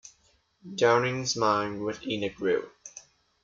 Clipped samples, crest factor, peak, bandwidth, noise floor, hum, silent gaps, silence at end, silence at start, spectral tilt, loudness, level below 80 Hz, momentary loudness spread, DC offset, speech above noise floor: under 0.1%; 20 dB; -10 dBFS; 7.6 kHz; -67 dBFS; none; none; 0.45 s; 0.05 s; -4 dB/octave; -27 LUFS; -66 dBFS; 21 LU; under 0.1%; 40 dB